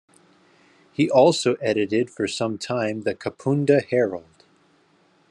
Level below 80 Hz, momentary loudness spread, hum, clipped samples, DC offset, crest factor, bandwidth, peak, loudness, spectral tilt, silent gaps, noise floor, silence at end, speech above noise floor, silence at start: -72 dBFS; 11 LU; none; under 0.1%; under 0.1%; 20 dB; 11 kHz; -4 dBFS; -22 LUFS; -5.5 dB/octave; none; -60 dBFS; 1.1 s; 39 dB; 1 s